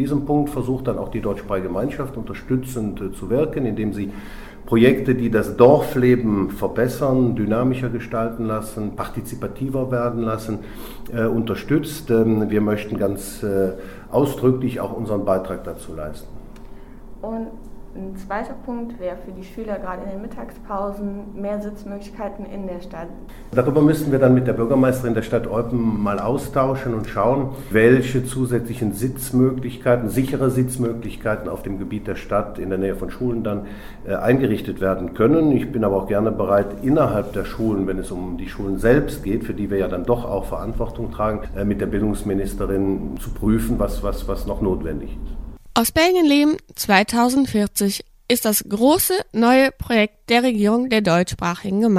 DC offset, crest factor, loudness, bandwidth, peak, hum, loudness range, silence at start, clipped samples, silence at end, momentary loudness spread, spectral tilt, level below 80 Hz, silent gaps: under 0.1%; 20 dB; -21 LUFS; 16.5 kHz; 0 dBFS; none; 11 LU; 0 s; under 0.1%; 0 s; 14 LU; -6 dB/octave; -36 dBFS; none